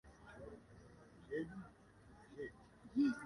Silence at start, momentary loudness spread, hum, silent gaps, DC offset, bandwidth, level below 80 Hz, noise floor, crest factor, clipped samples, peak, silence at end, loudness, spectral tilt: 0.05 s; 22 LU; none; none; under 0.1%; 11 kHz; -70 dBFS; -64 dBFS; 18 dB; under 0.1%; -26 dBFS; 0 s; -46 LUFS; -7 dB/octave